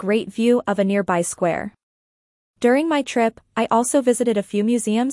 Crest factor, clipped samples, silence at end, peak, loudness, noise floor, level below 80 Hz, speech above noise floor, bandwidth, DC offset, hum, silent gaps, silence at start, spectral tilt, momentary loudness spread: 16 dB; under 0.1%; 0 s; -4 dBFS; -20 LUFS; under -90 dBFS; -62 dBFS; over 71 dB; 12 kHz; under 0.1%; none; 1.83-2.54 s; 0 s; -5 dB/octave; 5 LU